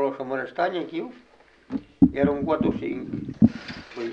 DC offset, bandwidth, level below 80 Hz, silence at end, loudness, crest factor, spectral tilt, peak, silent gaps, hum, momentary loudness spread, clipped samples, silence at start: under 0.1%; 6.8 kHz; -50 dBFS; 0 s; -25 LUFS; 22 dB; -8.5 dB/octave; -4 dBFS; none; none; 14 LU; under 0.1%; 0 s